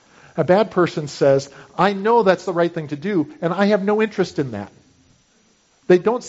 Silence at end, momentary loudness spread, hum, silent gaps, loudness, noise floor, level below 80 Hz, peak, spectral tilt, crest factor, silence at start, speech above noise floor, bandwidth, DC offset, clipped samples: 0 s; 12 LU; none; none; -19 LUFS; -59 dBFS; -60 dBFS; -2 dBFS; -5.5 dB/octave; 18 dB; 0.35 s; 40 dB; 8 kHz; under 0.1%; under 0.1%